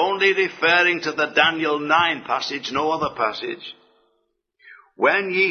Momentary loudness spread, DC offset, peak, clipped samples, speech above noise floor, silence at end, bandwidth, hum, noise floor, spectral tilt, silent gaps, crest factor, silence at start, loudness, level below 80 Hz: 8 LU; under 0.1%; -2 dBFS; under 0.1%; 50 dB; 0 s; 6.6 kHz; none; -71 dBFS; -3.5 dB/octave; none; 20 dB; 0 s; -19 LUFS; -60 dBFS